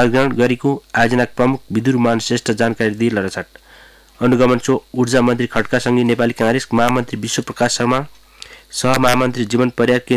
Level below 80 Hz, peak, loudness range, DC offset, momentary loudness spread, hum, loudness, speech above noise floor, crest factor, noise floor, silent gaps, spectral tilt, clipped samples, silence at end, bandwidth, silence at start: -46 dBFS; -4 dBFS; 2 LU; under 0.1%; 7 LU; none; -16 LUFS; 29 dB; 12 dB; -45 dBFS; none; -5 dB/octave; under 0.1%; 0 s; 15.5 kHz; 0 s